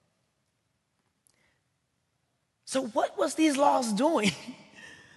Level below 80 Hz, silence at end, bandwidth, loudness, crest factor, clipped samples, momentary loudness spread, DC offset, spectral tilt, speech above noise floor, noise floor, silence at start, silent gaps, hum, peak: -74 dBFS; 0.2 s; 12.5 kHz; -27 LUFS; 20 dB; under 0.1%; 23 LU; under 0.1%; -4 dB/octave; 50 dB; -77 dBFS; 2.65 s; none; none; -10 dBFS